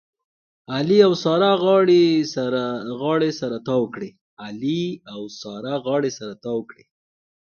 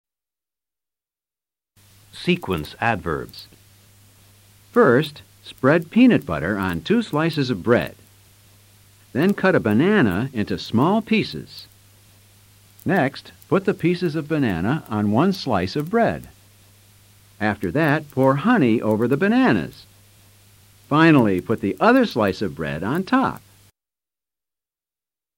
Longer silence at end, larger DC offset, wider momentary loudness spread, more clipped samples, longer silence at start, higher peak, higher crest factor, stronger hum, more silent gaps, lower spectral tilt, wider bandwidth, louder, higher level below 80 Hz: second, 0.95 s vs 2 s; neither; first, 18 LU vs 12 LU; neither; second, 0.7 s vs 2.15 s; about the same, -2 dBFS vs -4 dBFS; about the same, 18 dB vs 18 dB; neither; first, 4.21-4.37 s vs none; about the same, -6 dB/octave vs -7 dB/octave; second, 6.8 kHz vs 16.5 kHz; about the same, -20 LUFS vs -20 LUFS; second, -66 dBFS vs -52 dBFS